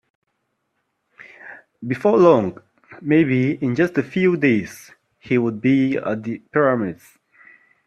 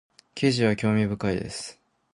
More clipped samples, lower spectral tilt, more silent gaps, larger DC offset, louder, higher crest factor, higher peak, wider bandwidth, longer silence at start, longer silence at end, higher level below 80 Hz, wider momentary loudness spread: neither; first, -8 dB/octave vs -6 dB/octave; neither; neither; first, -19 LUFS vs -25 LUFS; about the same, 20 dB vs 18 dB; first, 0 dBFS vs -8 dBFS; first, 13 kHz vs 11 kHz; first, 1.45 s vs 0.35 s; first, 0.95 s vs 0.45 s; second, -62 dBFS vs -52 dBFS; first, 20 LU vs 15 LU